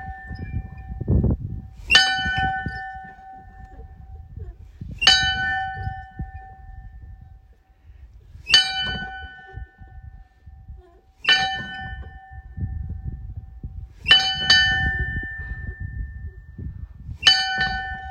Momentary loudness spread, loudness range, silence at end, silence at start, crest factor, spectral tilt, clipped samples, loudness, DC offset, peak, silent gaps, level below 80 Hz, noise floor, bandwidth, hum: 25 LU; 6 LU; 0 s; 0 s; 24 dB; -2 dB/octave; under 0.1%; -19 LUFS; under 0.1%; 0 dBFS; none; -36 dBFS; -53 dBFS; 14.5 kHz; none